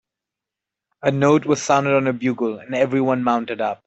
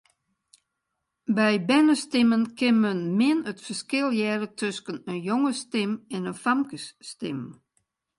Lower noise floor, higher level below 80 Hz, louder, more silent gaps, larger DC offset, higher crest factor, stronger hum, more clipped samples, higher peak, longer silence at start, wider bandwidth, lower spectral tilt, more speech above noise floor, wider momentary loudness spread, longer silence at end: first, -86 dBFS vs -81 dBFS; first, -64 dBFS vs -72 dBFS; first, -19 LUFS vs -25 LUFS; neither; neither; about the same, 18 dB vs 18 dB; neither; neither; first, -4 dBFS vs -8 dBFS; second, 1.05 s vs 1.3 s; second, 8.2 kHz vs 11.5 kHz; about the same, -6 dB/octave vs -5 dB/octave; first, 67 dB vs 57 dB; second, 7 LU vs 13 LU; second, 0.1 s vs 0.65 s